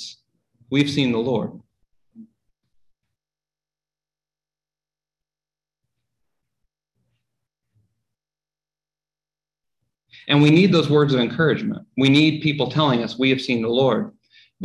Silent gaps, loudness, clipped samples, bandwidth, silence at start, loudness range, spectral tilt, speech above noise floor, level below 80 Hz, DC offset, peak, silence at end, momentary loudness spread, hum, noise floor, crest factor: none; -19 LUFS; under 0.1%; 11.5 kHz; 0 s; 10 LU; -6.5 dB/octave; over 72 dB; -60 dBFS; under 0.1%; -4 dBFS; 0 s; 11 LU; 50 Hz at -55 dBFS; under -90 dBFS; 20 dB